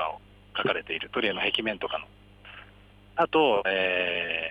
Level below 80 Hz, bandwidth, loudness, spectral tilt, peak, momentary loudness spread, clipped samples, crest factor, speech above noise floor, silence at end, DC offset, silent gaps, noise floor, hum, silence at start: -58 dBFS; 9.8 kHz; -27 LUFS; -5.5 dB/octave; -10 dBFS; 22 LU; under 0.1%; 18 dB; 26 dB; 0 s; under 0.1%; none; -53 dBFS; 50 Hz at -55 dBFS; 0 s